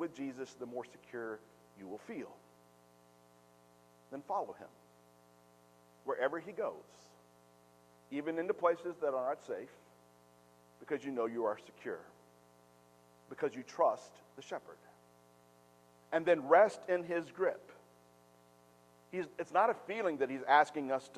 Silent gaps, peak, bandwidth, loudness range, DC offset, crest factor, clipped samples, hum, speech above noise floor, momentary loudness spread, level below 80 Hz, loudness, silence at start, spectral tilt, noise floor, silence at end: none; -14 dBFS; 14 kHz; 14 LU; under 0.1%; 24 dB; under 0.1%; 60 Hz at -70 dBFS; 29 dB; 21 LU; -86 dBFS; -36 LUFS; 0 s; -5 dB/octave; -65 dBFS; 0 s